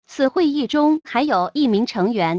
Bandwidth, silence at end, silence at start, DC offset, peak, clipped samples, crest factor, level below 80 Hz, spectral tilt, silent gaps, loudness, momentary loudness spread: 8 kHz; 0 s; 0.1 s; under 0.1%; -6 dBFS; under 0.1%; 12 dB; -58 dBFS; -6.5 dB/octave; none; -19 LUFS; 2 LU